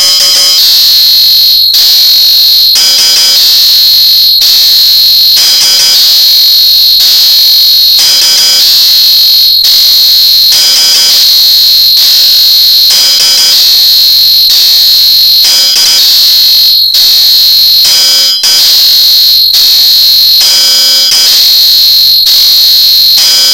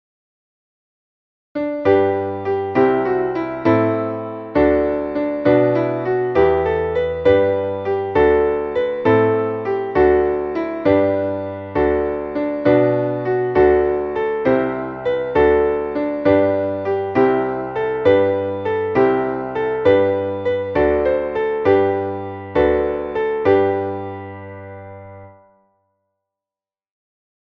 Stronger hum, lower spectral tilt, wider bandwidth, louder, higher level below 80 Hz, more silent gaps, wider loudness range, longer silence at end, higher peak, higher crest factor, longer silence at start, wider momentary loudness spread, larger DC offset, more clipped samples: neither; second, 3 dB/octave vs -9 dB/octave; first, over 20 kHz vs 5.8 kHz; first, 0 LUFS vs -18 LUFS; about the same, -42 dBFS vs -42 dBFS; neither; second, 0 LU vs 3 LU; second, 0 s vs 2.3 s; about the same, 0 dBFS vs -2 dBFS; second, 4 dB vs 16 dB; second, 0 s vs 1.55 s; second, 1 LU vs 8 LU; first, 1% vs under 0.1%; first, 5% vs under 0.1%